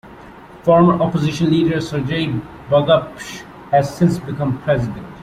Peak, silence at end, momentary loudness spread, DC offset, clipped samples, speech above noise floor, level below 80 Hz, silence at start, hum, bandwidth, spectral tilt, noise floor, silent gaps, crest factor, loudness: -2 dBFS; 0 s; 13 LU; under 0.1%; under 0.1%; 22 dB; -46 dBFS; 0.05 s; none; 13.5 kHz; -7 dB/octave; -39 dBFS; none; 16 dB; -17 LUFS